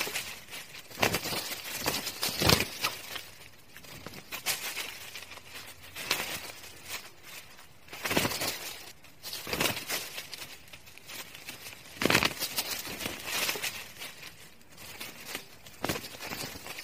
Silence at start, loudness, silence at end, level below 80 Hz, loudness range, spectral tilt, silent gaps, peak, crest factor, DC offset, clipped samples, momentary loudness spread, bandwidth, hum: 0 s; -32 LUFS; 0 s; -56 dBFS; 7 LU; -2 dB/octave; none; -2 dBFS; 34 dB; 0.2%; under 0.1%; 19 LU; 16 kHz; none